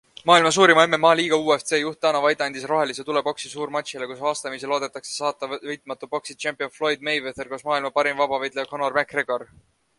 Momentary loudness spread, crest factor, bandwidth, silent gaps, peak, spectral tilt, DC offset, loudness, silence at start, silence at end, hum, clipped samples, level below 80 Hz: 14 LU; 22 dB; 11.5 kHz; none; 0 dBFS; -3 dB/octave; under 0.1%; -22 LUFS; 0.25 s; 0.55 s; none; under 0.1%; -66 dBFS